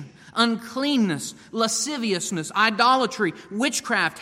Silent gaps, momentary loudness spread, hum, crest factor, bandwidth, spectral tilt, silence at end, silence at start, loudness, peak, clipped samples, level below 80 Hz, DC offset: none; 8 LU; none; 18 dB; 16 kHz; -3 dB/octave; 0 s; 0 s; -23 LUFS; -4 dBFS; under 0.1%; -68 dBFS; under 0.1%